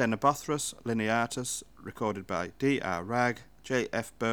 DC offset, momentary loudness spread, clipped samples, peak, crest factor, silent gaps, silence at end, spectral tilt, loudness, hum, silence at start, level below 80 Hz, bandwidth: 0.1%; 7 LU; under 0.1%; -12 dBFS; 20 dB; none; 0 s; -4.5 dB/octave; -31 LUFS; none; 0 s; -62 dBFS; over 20 kHz